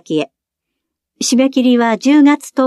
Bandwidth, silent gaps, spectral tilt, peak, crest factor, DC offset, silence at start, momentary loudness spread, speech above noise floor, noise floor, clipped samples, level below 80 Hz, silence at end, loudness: 13 kHz; none; -3.5 dB/octave; 0 dBFS; 12 dB; under 0.1%; 0.1 s; 10 LU; 66 dB; -78 dBFS; under 0.1%; -70 dBFS; 0 s; -13 LUFS